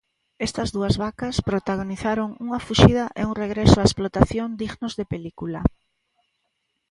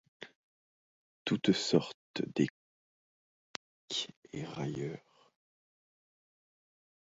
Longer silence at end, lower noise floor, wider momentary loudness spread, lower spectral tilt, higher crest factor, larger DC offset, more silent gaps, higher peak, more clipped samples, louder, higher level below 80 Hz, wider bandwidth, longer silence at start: second, 1.25 s vs 2 s; second, -75 dBFS vs under -90 dBFS; second, 13 LU vs 19 LU; first, -6 dB/octave vs -4.5 dB/octave; about the same, 22 dB vs 26 dB; neither; second, none vs 0.35-1.26 s, 1.94-2.14 s, 2.50-3.88 s, 4.17-4.22 s; first, 0 dBFS vs -12 dBFS; neither; first, -22 LUFS vs -35 LUFS; first, -36 dBFS vs -74 dBFS; first, 11.5 kHz vs 7.6 kHz; first, 0.4 s vs 0.2 s